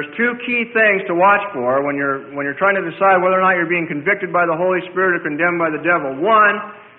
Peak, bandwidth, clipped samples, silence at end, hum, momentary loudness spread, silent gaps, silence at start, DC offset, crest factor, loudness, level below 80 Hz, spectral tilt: -2 dBFS; 4.1 kHz; under 0.1%; 0.15 s; none; 6 LU; none; 0 s; under 0.1%; 14 dB; -16 LUFS; -62 dBFS; -10.5 dB/octave